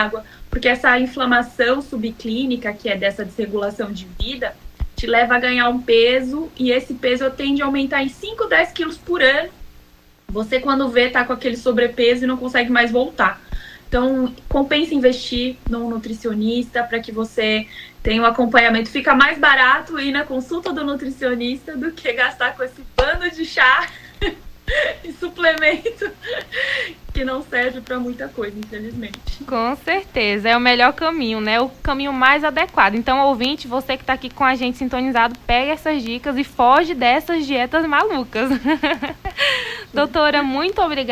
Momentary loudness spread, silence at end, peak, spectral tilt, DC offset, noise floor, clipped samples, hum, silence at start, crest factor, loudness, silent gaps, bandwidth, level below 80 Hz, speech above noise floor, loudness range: 13 LU; 0 s; 0 dBFS; -4.5 dB/octave; under 0.1%; -49 dBFS; under 0.1%; 60 Hz at -50 dBFS; 0 s; 18 dB; -18 LUFS; none; 16 kHz; -36 dBFS; 31 dB; 6 LU